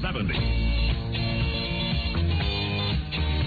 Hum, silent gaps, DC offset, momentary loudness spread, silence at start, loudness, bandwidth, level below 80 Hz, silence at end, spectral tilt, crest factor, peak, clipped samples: none; none; under 0.1%; 2 LU; 0 s; -26 LUFS; 4.9 kHz; -30 dBFS; 0 s; -8 dB/octave; 12 dB; -14 dBFS; under 0.1%